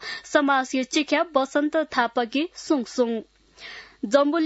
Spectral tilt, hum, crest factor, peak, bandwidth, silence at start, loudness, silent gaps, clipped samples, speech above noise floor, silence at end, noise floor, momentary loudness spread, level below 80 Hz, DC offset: -3 dB/octave; none; 18 dB; -6 dBFS; 8 kHz; 0 s; -23 LUFS; none; under 0.1%; 20 dB; 0 s; -43 dBFS; 15 LU; -66 dBFS; under 0.1%